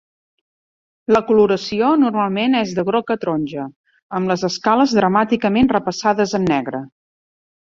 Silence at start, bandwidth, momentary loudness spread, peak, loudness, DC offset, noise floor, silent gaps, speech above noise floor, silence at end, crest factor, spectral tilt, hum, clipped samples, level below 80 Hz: 1.1 s; 7.6 kHz; 12 LU; -2 dBFS; -17 LUFS; under 0.1%; under -90 dBFS; 3.76-3.84 s, 4.03-4.09 s; over 73 dB; 0.85 s; 16 dB; -6 dB/octave; none; under 0.1%; -52 dBFS